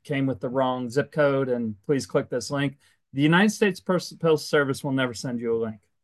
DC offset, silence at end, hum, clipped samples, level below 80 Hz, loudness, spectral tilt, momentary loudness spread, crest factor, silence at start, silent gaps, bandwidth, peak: under 0.1%; 0.25 s; none; under 0.1%; -64 dBFS; -25 LUFS; -5.5 dB/octave; 8 LU; 20 dB; 0.1 s; none; 12.5 kHz; -6 dBFS